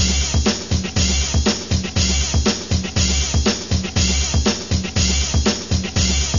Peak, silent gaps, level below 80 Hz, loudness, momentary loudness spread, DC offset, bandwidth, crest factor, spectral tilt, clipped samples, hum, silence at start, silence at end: -4 dBFS; none; -24 dBFS; -18 LUFS; 4 LU; 0.6%; 7.4 kHz; 14 dB; -3.5 dB/octave; under 0.1%; none; 0 s; 0 s